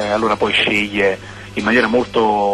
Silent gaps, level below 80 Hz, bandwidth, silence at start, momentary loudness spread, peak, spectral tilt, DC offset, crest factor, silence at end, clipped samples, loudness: none; -46 dBFS; 12.5 kHz; 0 s; 7 LU; -4 dBFS; -4.5 dB/octave; under 0.1%; 12 dB; 0 s; under 0.1%; -16 LUFS